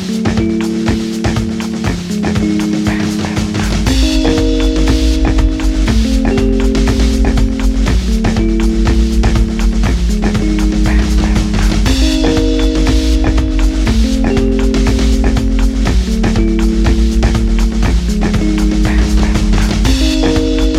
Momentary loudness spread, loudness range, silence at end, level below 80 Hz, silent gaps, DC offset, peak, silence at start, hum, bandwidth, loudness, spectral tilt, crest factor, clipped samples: 3 LU; 1 LU; 0 s; -14 dBFS; none; under 0.1%; 0 dBFS; 0 s; none; 13 kHz; -13 LUFS; -6 dB/octave; 10 dB; under 0.1%